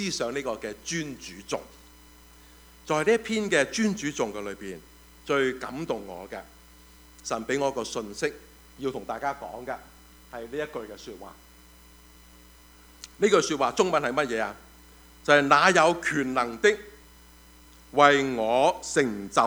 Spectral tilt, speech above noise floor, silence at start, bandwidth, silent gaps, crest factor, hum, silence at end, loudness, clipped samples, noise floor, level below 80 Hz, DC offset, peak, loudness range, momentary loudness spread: -3.5 dB/octave; 27 dB; 0 s; over 20 kHz; none; 24 dB; none; 0 s; -26 LUFS; under 0.1%; -53 dBFS; -56 dBFS; under 0.1%; -4 dBFS; 13 LU; 21 LU